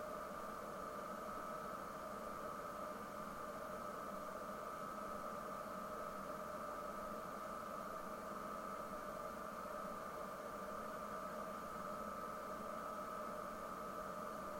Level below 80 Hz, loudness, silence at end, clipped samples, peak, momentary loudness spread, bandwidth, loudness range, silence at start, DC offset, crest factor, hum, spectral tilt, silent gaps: -68 dBFS; -48 LUFS; 0 s; under 0.1%; -36 dBFS; 1 LU; 16.5 kHz; 1 LU; 0 s; under 0.1%; 12 dB; none; -4.5 dB/octave; none